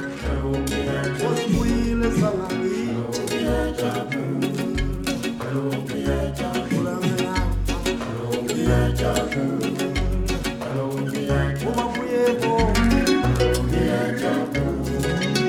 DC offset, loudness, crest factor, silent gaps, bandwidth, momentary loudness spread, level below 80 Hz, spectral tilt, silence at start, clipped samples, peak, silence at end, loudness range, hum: under 0.1%; -23 LUFS; 16 dB; none; 17.5 kHz; 6 LU; -30 dBFS; -5.5 dB/octave; 0 s; under 0.1%; -6 dBFS; 0 s; 4 LU; none